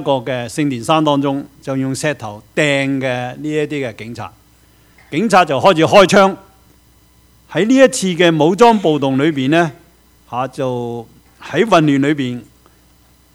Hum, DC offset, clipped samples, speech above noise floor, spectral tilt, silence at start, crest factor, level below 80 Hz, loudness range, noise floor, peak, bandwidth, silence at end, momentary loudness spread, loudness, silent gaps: none; under 0.1%; 0.2%; 36 dB; -5 dB/octave; 0 s; 16 dB; -52 dBFS; 6 LU; -50 dBFS; 0 dBFS; 16 kHz; 0.9 s; 14 LU; -14 LUFS; none